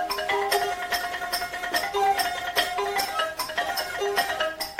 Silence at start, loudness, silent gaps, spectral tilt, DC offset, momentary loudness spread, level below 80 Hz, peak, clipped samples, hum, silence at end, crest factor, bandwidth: 0 s; -26 LUFS; none; -1 dB/octave; under 0.1%; 4 LU; -56 dBFS; -8 dBFS; under 0.1%; none; 0 s; 18 dB; 16.5 kHz